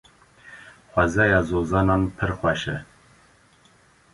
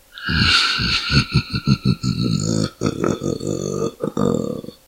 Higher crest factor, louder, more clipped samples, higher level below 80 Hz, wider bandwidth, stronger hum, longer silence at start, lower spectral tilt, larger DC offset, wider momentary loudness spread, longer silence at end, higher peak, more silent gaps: about the same, 20 dB vs 18 dB; second, -22 LUFS vs -19 LUFS; neither; about the same, -40 dBFS vs -36 dBFS; second, 11.5 kHz vs 16 kHz; neither; first, 0.45 s vs 0.15 s; first, -6.5 dB/octave vs -4.5 dB/octave; neither; first, 14 LU vs 9 LU; first, 1.3 s vs 0.15 s; about the same, -4 dBFS vs -2 dBFS; neither